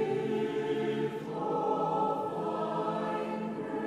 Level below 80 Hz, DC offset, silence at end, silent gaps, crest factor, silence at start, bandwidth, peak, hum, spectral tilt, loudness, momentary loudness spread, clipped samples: -72 dBFS; under 0.1%; 0 s; none; 14 dB; 0 s; 11.5 kHz; -18 dBFS; none; -7 dB/octave; -32 LUFS; 5 LU; under 0.1%